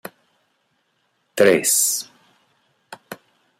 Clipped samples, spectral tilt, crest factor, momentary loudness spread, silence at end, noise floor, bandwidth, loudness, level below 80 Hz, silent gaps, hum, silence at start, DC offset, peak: under 0.1%; -2 dB/octave; 22 dB; 25 LU; 0.45 s; -68 dBFS; 16 kHz; -17 LUFS; -68 dBFS; none; none; 1.35 s; under 0.1%; -2 dBFS